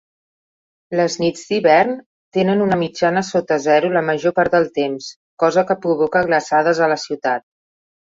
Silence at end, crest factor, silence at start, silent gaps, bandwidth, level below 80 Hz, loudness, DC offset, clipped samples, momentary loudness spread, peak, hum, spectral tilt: 0.8 s; 16 dB; 0.9 s; 2.06-2.32 s, 5.16-5.37 s; 7.8 kHz; -58 dBFS; -17 LUFS; under 0.1%; under 0.1%; 8 LU; -2 dBFS; none; -5 dB/octave